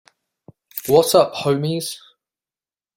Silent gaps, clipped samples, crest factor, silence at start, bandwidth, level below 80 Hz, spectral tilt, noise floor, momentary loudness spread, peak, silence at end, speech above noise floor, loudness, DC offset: none; under 0.1%; 20 dB; 0.75 s; 16.5 kHz; -60 dBFS; -5 dB/octave; under -90 dBFS; 17 LU; -2 dBFS; 1 s; over 73 dB; -18 LUFS; under 0.1%